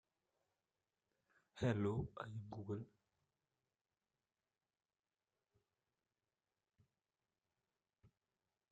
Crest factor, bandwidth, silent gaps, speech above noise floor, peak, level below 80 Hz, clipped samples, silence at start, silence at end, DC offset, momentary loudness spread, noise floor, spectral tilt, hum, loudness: 24 dB; 8.8 kHz; 4.99-5.03 s; over 47 dB; -28 dBFS; -74 dBFS; under 0.1%; 1.55 s; 0.65 s; under 0.1%; 15 LU; under -90 dBFS; -8 dB/octave; none; -45 LUFS